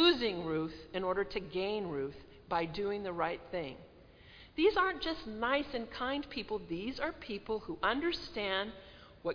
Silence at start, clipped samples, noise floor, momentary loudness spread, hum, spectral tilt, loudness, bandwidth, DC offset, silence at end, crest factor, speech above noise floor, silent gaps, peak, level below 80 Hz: 0 s; under 0.1%; -57 dBFS; 11 LU; none; -6 dB/octave; -36 LUFS; 5.2 kHz; under 0.1%; 0 s; 20 dB; 21 dB; none; -16 dBFS; -58 dBFS